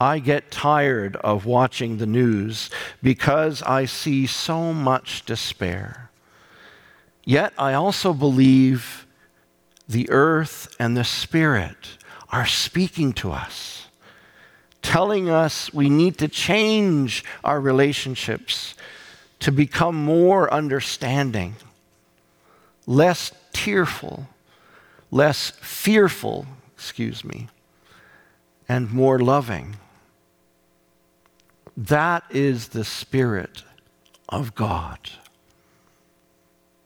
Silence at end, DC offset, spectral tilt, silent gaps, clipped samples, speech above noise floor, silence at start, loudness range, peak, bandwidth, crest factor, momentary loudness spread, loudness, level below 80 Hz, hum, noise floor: 1.7 s; under 0.1%; -5.5 dB/octave; none; under 0.1%; 42 dB; 0 s; 5 LU; -6 dBFS; 18.5 kHz; 16 dB; 16 LU; -21 LUFS; -52 dBFS; none; -62 dBFS